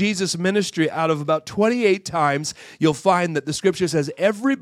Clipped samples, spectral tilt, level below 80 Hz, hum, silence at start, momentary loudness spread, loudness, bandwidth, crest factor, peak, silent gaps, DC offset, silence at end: under 0.1%; -5 dB/octave; -62 dBFS; none; 0 s; 4 LU; -21 LUFS; 14.5 kHz; 18 dB; -4 dBFS; none; under 0.1%; 0 s